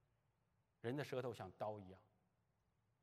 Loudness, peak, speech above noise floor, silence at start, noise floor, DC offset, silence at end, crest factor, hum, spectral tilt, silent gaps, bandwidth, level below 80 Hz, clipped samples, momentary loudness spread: -49 LUFS; -32 dBFS; 36 dB; 0.85 s; -84 dBFS; under 0.1%; 1 s; 20 dB; none; -6.5 dB/octave; none; 13.5 kHz; under -90 dBFS; under 0.1%; 15 LU